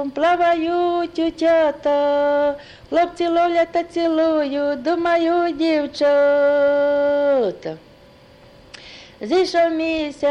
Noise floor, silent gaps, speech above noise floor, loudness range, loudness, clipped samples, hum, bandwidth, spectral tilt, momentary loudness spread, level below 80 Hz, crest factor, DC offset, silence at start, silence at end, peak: -47 dBFS; none; 29 dB; 3 LU; -18 LUFS; under 0.1%; none; 9.6 kHz; -5 dB/octave; 7 LU; -54 dBFS; 12 dB; under 0.1%; 0 s; 0 s; -8 dBFS